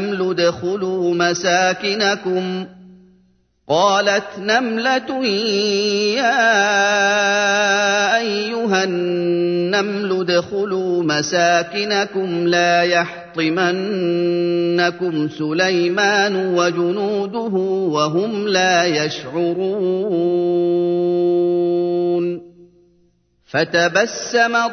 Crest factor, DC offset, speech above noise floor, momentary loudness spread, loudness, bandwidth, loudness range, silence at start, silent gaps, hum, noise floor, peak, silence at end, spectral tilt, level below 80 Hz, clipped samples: 16 dB; under 0.1%; 42 dB; 6 LU; -17 LUFS; 6.6 kHz; 4 LU; 0 s; none; none; -59 dBFS; -2 dBFS; 0 s; -4 dB/octave; -64 dBFS; under 0.1%